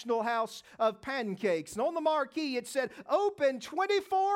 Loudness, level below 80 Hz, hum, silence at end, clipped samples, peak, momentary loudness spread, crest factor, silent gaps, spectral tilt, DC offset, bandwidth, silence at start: -31 LUFS; -74 dBFS; none; 0 s; under 0.1%; -16 dBFS; 6 LU; 14 dB; none; -4 dB/octave; under 0.1%; 16.5 kHz; 0 s